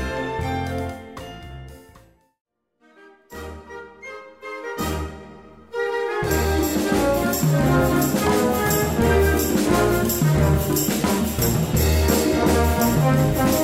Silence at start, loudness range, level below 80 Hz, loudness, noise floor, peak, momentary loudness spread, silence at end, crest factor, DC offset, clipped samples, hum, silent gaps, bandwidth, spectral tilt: 0 s; 18 LU; -32 dBFS; -20 LUFS; -59 dBFS; -4 dBFS; 19 LU; 0 s; 16 dB; 0.2%; under 0.1%; none; 2.41-2.45 s; 16.5 kHz; -5.5 dB/octave